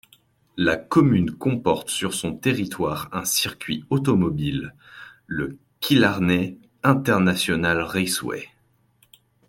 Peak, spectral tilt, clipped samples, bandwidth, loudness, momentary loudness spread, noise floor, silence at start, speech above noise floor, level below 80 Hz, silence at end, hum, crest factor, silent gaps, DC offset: -4 dBFS; -5 dB/octave; under 0.1%; 16.5 kHz; -22 LUFS; 13 LU; -63 dBFS; 0.55 s; 41 dB; -52 dBFS; 1.05 s; none; 20 dB; none; under 0.1%